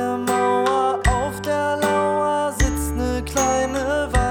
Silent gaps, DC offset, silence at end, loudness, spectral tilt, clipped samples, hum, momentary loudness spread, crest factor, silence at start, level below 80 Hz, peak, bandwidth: none; under 0.1%; 0 s; -21 LUFS; -4.5 dB/octave; under 0.1%; none; 4 LU; 14 dB; 0 s; -28 dBFS; -6 dBFS; over 20 kHz